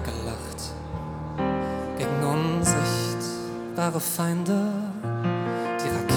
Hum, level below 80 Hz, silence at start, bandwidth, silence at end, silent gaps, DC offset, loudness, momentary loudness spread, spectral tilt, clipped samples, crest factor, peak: none; -46 dBFS; 0 s; over 20 kHz; 0 s; none; under 0.1%; -27 LUFS; 11 LU; -5 dB/octave; under 0.1%; 18 dB; -8 dBFS